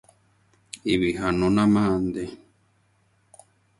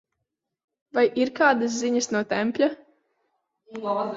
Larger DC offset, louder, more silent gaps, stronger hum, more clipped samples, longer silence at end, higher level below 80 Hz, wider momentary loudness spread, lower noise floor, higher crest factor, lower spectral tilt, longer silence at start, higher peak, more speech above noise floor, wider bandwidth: neither; about the same, -23 LUFS vs -24 LUFS; neither; neither; neither; first, 1.45 s vs 0 s; first, -48 dBFS vs -70 dBFS; first, 15 LU vs 12 LU; second, -65 dBFS vs -82 dBFS; about the same, 18 dB vs 20 dB; first, -6.5 dB/octave vs -3.5 dB/octave; second, 0.75 s vs 0.95 s; about the same, -8 dBFS vs -6 dBFS; second, 43 dB vs 59 dB; first, 11.5 kHz vs 7.8 kHz